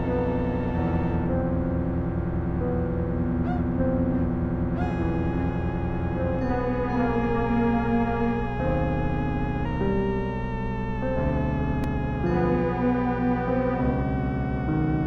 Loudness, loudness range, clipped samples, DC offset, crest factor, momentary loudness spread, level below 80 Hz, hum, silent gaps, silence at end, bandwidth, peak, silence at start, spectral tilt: -26 LUFS; 2 LU; under 0.1%; under 0.1%; 12 dB; 4 LU; -34 dBFS; none; none; 0 s; 6.2 kHz; -12 dBFS; 0 s; -10 dB/octave